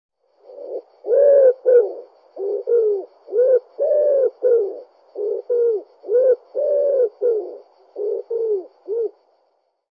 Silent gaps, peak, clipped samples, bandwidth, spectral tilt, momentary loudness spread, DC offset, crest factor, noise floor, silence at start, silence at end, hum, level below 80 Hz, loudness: none; -4 dBFS; under 0.1%; 1.9 kHz; -7 dB/octave; 18 LU; under 0.1%; 14 dB; -66 dBFS; 0.5 s; 0.85 s; none; under -90 dBFS; -19 LUFS